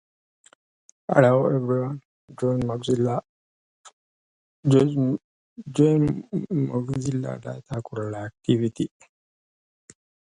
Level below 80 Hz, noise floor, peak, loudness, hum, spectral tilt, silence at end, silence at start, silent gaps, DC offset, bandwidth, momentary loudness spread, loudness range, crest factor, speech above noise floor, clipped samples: -56 dBFS; under -90 dBFS; -2 dBFS; -24 LUFS; none; -8 dB/octave; 1.5 s; 1.1 s; 2.05-2.28 s, 3.29-3.84 s, 3.93-4.63 s, 5.24-5.56 s; under 0.1%; 11 kHz; 13 LU; 5 LU; 22 dB; over 67 dB; under 0.1%